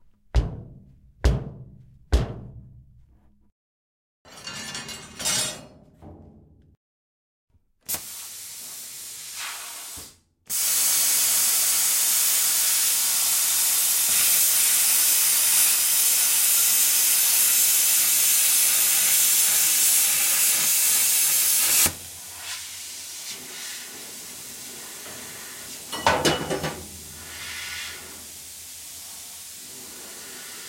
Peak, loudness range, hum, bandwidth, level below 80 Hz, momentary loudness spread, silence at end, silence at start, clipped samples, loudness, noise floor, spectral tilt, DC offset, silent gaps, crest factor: -6 dBFS; 18 LU; none; 16.5 kHz; -40 dBFS; 20 LU; 0 s; 0.35 s; under 0.1%; -18 LUFS; -56 dBFS; -0.5 dB/octave; under 0.1%; 3.52-4.25 s, 6.77-7.48 s; 18 dB